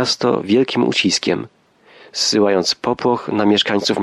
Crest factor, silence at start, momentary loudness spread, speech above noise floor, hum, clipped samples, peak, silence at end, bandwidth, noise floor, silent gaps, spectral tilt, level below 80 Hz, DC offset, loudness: 14 dB; 0 s; 6 LU; 31 dB; none; under 0.1%; -2 dBFS; 0 s; 12.5 kHz; -48 dBFS; none; -3.5 dB/octave; -60 dBFS; under 0.1%; -16 LUFS